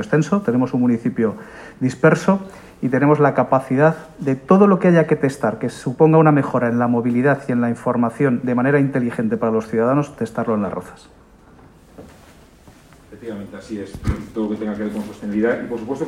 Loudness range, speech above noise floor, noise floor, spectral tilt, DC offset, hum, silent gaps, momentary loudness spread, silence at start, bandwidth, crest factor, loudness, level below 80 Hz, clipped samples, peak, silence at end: 13 LU; 29 dB; -47 dBFS; -8 dB/octave; under 0.1%; none; none; 12 LU; 0 s; 12 kHz; 18 dB; -18 LUFS; -46 dBFS; under 0.1%; 0 dBFS; 0 s